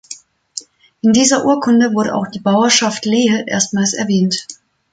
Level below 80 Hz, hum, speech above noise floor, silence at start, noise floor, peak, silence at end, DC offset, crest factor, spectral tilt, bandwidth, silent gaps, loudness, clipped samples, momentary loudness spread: -56 dBFS; none; 23 dB; 0.1 s; -37 dBFS; 0 dBFS; 0.4 s; under 0.1%; 16 dB; -3.5 dB/octave; 9.6 kHz; none; -14 LUFS; under 0.1%; 18 LU